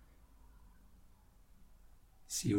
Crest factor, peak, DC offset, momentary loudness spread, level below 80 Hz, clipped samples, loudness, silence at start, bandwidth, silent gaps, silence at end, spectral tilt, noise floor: 22 dB; -22 dBFS; under 0.1%; 26 LU; -62 dBFS; under 0.1%; -40 LUFS; 0.9 s; 17.5 kHz; none; 0 s; -4.5 dB/octave; -63 dBFS